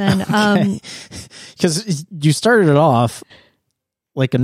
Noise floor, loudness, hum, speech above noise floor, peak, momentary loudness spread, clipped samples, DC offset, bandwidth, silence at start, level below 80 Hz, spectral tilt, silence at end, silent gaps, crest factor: -76 dBFS; -16 LUFS; none; 60 dB; -2 dBFS; 21 LU; under 0.1%; under 0.1%; 15.5 kHz; 0 s; -52 dBFS; -5.5 dB/octave; 0 s; none; 16 dB